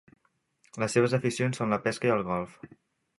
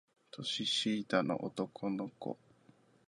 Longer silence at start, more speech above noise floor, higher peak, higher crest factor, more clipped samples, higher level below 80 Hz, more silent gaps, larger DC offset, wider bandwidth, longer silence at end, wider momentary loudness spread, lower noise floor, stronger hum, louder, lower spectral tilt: first, 0.75 s vs 0.35 s; first, 42 dB vs 30 dB; first, -10 dBFS vs -16 dBFS; about the same, 20 dB vs 22 dB; neither; first, -64 dBFS vs -78 dBFS; neither; neither; about the same, 11.5 kHz vs 11.5 kHz; second, 0.55 s vs 0.75 s; second, 9 LU vs 12 LU; about the same, -69 dBFS vs -66 dBFS; neither; first, -28 LUFS vs -36 LUFS; first, -5.5 dB/octave vs -4 dB/octave